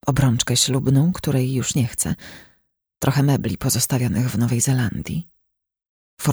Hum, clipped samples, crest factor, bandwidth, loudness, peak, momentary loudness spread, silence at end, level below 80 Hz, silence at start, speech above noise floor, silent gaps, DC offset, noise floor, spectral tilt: none; under 0.1%; 18 dB; over 20 kHz; -20 LUFS; -2 dBFS; 9 LU; 0 s; -44 dBFS; 0.05 s; 55 dB; 5.89-6.17 s; under 0.1%; -74 dBFS; -4.5 dB/octave